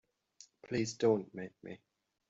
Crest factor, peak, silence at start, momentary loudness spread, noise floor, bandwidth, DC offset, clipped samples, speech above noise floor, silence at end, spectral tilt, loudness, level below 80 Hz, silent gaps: 22 dB; -16 dBFS; 0.65 s; 21 LU; -63 dBFS; 7.8 kHz; under 0.1%; under 0.1%; 28 dB; 0.55 s; -5.5 dB/octave; -35 LUFS; -74 dBFS; none